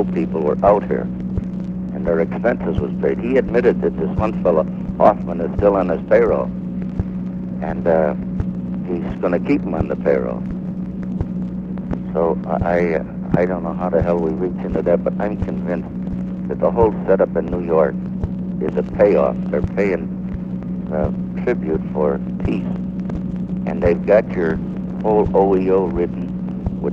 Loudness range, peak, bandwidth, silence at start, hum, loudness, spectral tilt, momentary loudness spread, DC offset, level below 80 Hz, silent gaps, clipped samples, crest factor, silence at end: 4 LU; 0 dBFS; 5.6 kHz; 0 s; none; -19 LUFS; -10 dB/octave; 10 LU; under 0.1%; -34 dBFS; none; under 0.1%; 18 dB; 0 s